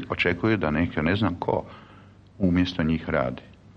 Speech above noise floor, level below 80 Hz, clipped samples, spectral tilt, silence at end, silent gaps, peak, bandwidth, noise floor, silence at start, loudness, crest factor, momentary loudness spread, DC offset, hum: 26 dB; -44 dBFS; under 0.1%; -8 dB/octave; 0.25 s; none; -8 dBFS; 7.2 kHz; -50 dBFS; 0 s; -25 LUFS; 16 dB; 7 LU; under 0.1%; none